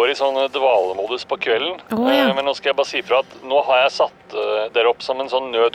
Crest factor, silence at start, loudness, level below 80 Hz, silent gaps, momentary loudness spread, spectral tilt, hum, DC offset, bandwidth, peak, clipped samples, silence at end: 12 dB; 0 s; -19 LUFS; -64 dBFS; none; 6 LU; -3.5 dB/octave; none; under 0.1%; 15.5 kHz; -6 dBFS; under 0.1%; 0.05 s